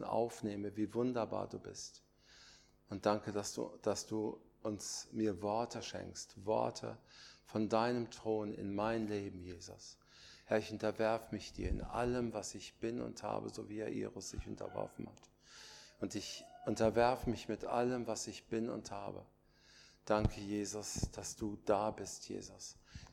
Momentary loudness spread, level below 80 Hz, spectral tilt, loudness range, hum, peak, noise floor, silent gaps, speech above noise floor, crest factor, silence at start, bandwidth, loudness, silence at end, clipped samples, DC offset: 16 LU; -56 dBFS; -5 dB/octave; 4 LU; none; -18 dBFS; -65 dBFS; none; 26 dB; 24 dB; 0 s; 17 kHz; -40 LUFS; 0 s; under 0.1%; under 0.1%